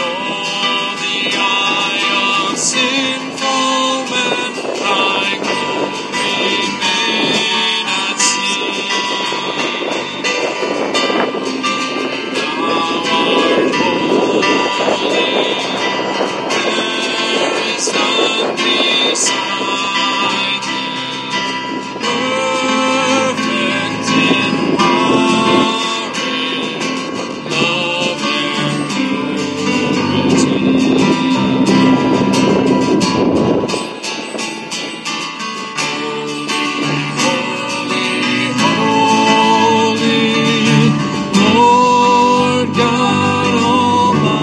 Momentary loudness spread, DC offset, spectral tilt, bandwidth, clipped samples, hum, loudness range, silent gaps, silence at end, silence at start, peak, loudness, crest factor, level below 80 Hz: 7 LU; under 0.1%; -3.5 dB/octave; 12 kHz; under 0.1%; none; 5 LU; none; 0 s; 0 s; 0 dBFS; -14 LUFS; 14 dB; -54 dBFS